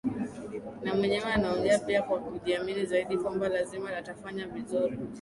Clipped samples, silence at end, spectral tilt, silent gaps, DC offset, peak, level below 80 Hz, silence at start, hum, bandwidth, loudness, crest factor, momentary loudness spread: under 0.1%; 0 s; -5.5 dB/octave; none; under 0.1%; -12 dBFS; -56 dBFS; 0.05 s; none; 11.5 kHz; -31 LUFS; 18 dB; 11 LU